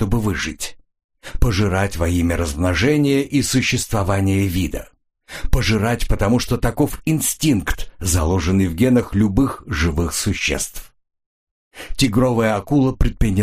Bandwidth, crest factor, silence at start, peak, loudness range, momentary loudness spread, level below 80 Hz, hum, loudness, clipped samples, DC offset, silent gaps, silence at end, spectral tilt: 15.5 kHz; 18 dB; 0 s; 0 dBFS; 2 LU; 9 LU; -28 dBFS; none; -19 LUFS; under 0.1%; under 0.1%; 1.04-1.09 s, 11.26-11.71 s; 0 s; -5 dB/octave